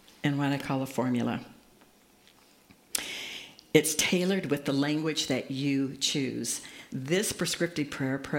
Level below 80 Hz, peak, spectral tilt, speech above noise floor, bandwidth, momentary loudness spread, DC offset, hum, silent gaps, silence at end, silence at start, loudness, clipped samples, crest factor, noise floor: -66 dBFS; -2 dBFS; -4 dB/octave; 31 dB; 16.5 kHz; 10 LU; under 0.1%; none; none; 0 s; 0.25 s; -29 LUFS; under 0.1%; 28 dB; -60 dBFS